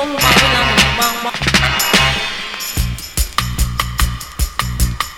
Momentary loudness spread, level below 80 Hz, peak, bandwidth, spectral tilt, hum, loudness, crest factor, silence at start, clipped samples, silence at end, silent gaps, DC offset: 10 LU; -22 dBFS; 0 dBFS; 20 kHz; -2.5 dB/octave; none; -14 LUFS; 16 dB; 0 s; under 0.1%; 0 s; none; under 0.1%